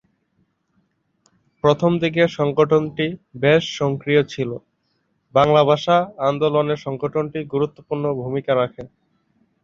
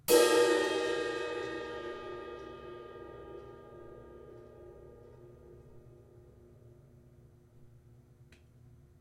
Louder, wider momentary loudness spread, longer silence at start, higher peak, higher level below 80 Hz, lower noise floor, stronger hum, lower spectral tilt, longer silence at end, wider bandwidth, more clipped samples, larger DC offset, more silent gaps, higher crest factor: first, -20 LUFS vs -31 LUFS; second, 9 LU vs 29 LU; first, 1.65 s vs 0.1 s; first, -2 dBFS vs -12 dBFS; first, -58 dBFS vs -64 dBFS; first, -68 dBFS vs -60 dBFS; neither; first, -6.5 dB/octave vs -3 dB/octave; second, 0.75 s vs 1.35 s; second, 7.4 kHz vs 16.5 kHz; neither; neither; neither; second, 18 dB vs 24 dB